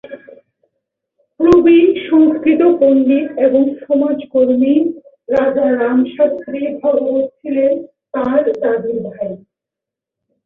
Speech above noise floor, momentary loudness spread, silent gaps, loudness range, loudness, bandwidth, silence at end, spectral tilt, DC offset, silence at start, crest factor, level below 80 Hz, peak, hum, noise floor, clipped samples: 71 dB; 12 LU; none; 6 LU; -14 LUFS; 4.9 kHz; 1.1 s; -8 dB/octave; under 0.1%; 0.1 s; 12 dB; -50 dBFS; -2 dBFS; none; -84 dBFS; under 0.1%